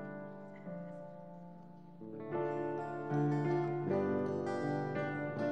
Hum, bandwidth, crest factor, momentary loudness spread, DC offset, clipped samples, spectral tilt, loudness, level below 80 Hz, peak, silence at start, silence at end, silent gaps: none; 8.4 kHz; 14 dB; 18 LU; 0.1%; under 0.1%; -9 dB/octave; -37 LUFS; -80 dBFS; -24 dBFS; 0 s; 0 s; none